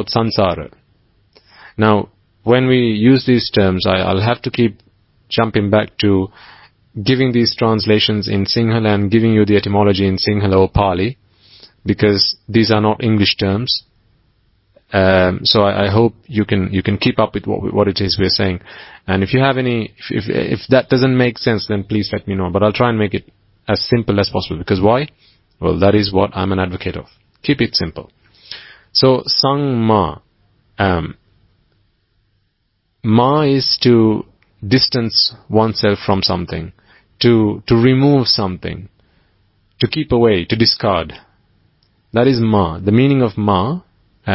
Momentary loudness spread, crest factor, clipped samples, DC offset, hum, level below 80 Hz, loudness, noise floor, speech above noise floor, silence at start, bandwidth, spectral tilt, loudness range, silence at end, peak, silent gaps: 11 LU; 16 dB; under 0.1%; under 0.1%; none; -38 dBFS; -15 LUFS; -66 dBFS; 51 dB; 0 s; 5.8 kHz; -9 dB/octave; 3 LU; 0 s; 0 dBFS; none